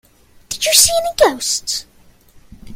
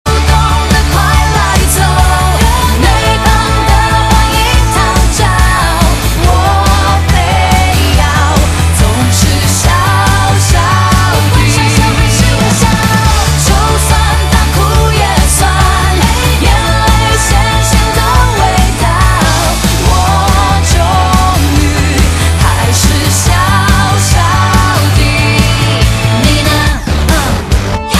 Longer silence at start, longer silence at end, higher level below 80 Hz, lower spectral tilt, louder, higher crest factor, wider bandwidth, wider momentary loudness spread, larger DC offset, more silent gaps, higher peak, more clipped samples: first, 0.5 s vs 0.05 s; about the same, 0 s vs 0 s; second, -44 dBFS vs -12 dBFS; second, 0 dB/octave vs -4 dB/octave; second, -14 LUFS vs -9 LUFS; first, 18 dB vs 8 dB; first, 16.5 kHz vs 14.5 kHz; first, 14 LU vs 1 LU; neither; neither; about the same, 0 dBFS vs 0 dBFS; second, under 0.1% vs 0.7%